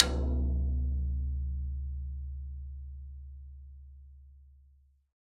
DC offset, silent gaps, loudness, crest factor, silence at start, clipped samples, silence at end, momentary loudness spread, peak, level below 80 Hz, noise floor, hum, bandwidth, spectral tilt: under 0.1%; none; -35 LUFS; 32 dB; 0 s; under 0.1%; 0.65 s; 21 LU; -2 dBFS; -36 dBFS; -63 dBFS; none; 9.4 kHz; -6 dB/octave